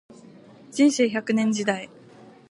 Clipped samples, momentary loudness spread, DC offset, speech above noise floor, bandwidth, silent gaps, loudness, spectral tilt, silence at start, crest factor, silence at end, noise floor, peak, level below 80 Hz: under 0.1%; 14 LU; under 0.1%; 27 dB; 11.5 kHz; none; -23 LUFS; -4.5 dB/octave; 0.7 s; 16 dB; 0.65 s; -49 dBFS; -8 dBFS; -76 dBFS